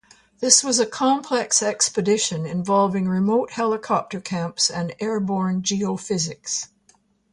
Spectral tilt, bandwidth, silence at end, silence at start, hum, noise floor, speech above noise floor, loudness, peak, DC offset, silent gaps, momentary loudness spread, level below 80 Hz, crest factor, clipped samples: -3.5 dB/octave; 11.5 kHz; 0.65 s; 0.4 s; none; -60 dBFS; 39 dB; -21 LUFS; 0 dBFS; under 0.1%; none; 11 LU; -62 dBFS; 22 dB; under 0.1%